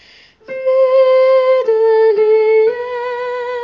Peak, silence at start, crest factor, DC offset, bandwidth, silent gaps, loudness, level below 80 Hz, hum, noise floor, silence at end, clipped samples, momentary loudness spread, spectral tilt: -4 dBFS; 0.5 s; 8 dB; under 0.1%; 5.6 kHz; none; -13 LUFS; -62 dBFS; none; -41 dBFS; 0 s; under 0.1%; 11 LU; -4 dB/octave